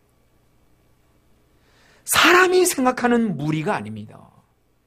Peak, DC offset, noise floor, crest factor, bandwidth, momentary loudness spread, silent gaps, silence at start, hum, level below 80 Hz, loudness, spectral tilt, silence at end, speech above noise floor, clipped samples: -2 dBFS; under 0.1%; -60 dBFS; 20 dB; 15.5 kHz; 20 LU; none; 2.05 s; none; -58 dBFS; -18 LUFS; -3.5 dB/octave; 0.75 s; 41 dB; under 0.1%